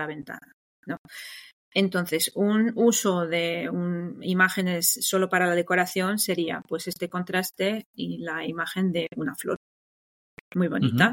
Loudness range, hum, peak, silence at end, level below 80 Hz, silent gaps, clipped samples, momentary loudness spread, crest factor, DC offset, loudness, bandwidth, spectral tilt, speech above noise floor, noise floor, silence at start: 6 LU; none; -6 dBFS; 0 s; -68 dBFS; 0.53-0.83 s, 0.98-1.05 s, 1.53-1.71 s, 7.86-7.94 s, 9.56-10.51 s; under 0.1%; 14 LU; 20 dB; under 0.1%; -25 LUFS; 17 kHz; -4 dB/octave; over 64 dB; under -90 dBFS; 0 s